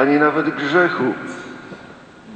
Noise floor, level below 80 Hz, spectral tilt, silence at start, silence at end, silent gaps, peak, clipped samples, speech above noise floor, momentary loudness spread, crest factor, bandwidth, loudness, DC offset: -41 dBFS; -62 dBFS; -6.5 dB/octave; 0 s; 0 s; none; -2 dBFS; under 0.1%; 23 dB; 21 LU; 18 dB; 8.8 kHz; -18 LUFS; under 0.1%